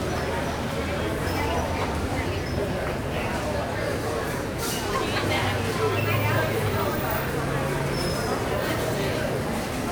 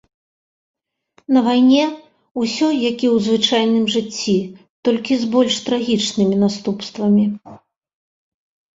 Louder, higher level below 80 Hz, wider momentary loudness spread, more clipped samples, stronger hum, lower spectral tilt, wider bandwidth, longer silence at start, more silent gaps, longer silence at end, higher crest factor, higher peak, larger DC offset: second, -26 LUFS vs -17 LUFS; first, -38 dBFS vs -60 dBFS; second, 4 LU vs 9 LU; neither; neither; about the same, -5 dB/octave vs -5 dB/octave; first, 19.5 kHz vs 7.8 kHz; second, 0 s vs 1.3 s; second, none vs 2.31-2.35 s, 4.70-4.83 s; second, 0 s vs 1.2 s; about the same, 14 dB vs 16 dB; second, -12 dBFS vs -2 dBFS; neither